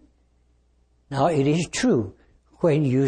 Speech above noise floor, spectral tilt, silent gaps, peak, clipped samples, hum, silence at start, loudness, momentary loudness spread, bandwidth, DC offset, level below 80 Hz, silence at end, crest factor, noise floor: 42 dB; -6.5 dB/octave; none; -8 dBFS; under 0.1%; 60 Hz at -50 dBFS; 1.1 s; -22 LUFS; 8 LU; 10 kHz; under 0.1%; -54 dBFS; 0 s; 14 dB; -62 dBFS